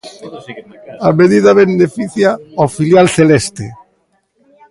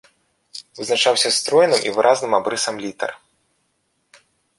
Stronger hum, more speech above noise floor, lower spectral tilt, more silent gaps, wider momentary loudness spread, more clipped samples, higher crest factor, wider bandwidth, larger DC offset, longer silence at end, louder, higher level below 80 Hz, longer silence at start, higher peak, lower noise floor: neither; about the same, 48 dB vs 51 dB; first, -6 dB/octave vs -1.5 dB/octave; neither; first, 22 LU vs 16 LU; neither; second, 12 dB vs 20 dB; about the same, 11.5 kHz vs 11.5 kHz; neither; second, 0.95 s vs 1.45 s; first, -11 LUFS vs -18 LUFS; first, -48 dBFS vs -68 dBFS; second, 0.05 s vs 0.55 s; about the same, 0 dBFS vs -2 dBFS; second, -60 dBFS vs -69 dBFS